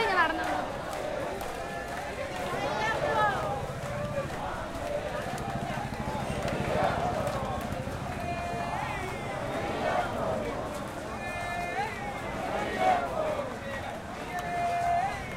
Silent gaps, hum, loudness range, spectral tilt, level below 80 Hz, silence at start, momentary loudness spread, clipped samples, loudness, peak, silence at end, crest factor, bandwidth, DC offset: none; none; 1 LU; -5 dB/octave; -48 dBFS; 0 s; 8 LU; under 0.1%; -32 LUFS; -12 dBFS; 0 s; 20 dB; 16 kHz; under 0.1%